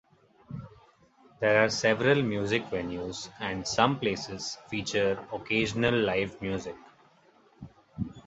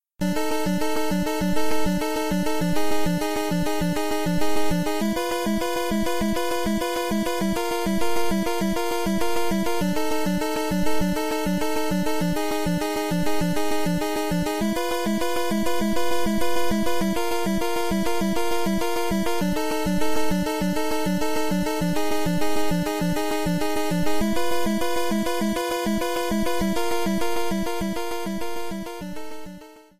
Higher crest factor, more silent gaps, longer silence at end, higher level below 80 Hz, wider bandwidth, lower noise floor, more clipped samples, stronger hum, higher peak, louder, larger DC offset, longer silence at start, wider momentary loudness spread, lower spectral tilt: first, 24 dB vs 12 dB; neither; about the same, 0.05 s vs 0 s; second, -56 dBFS vs -40 dBFS; second, 8.2 kHz vs 15.5 kHz; first, -61 dBFS vs -43 dBFS; neither; neither; first, -6 dBFS vs -12 dBFS; second, -28 LUFS vs -25 LUFS; neither; first, 0.5 s vs 0 s; first, 18 LU vs 1 LU; about the same, -4.5 dB/octave vs -5 dB/octave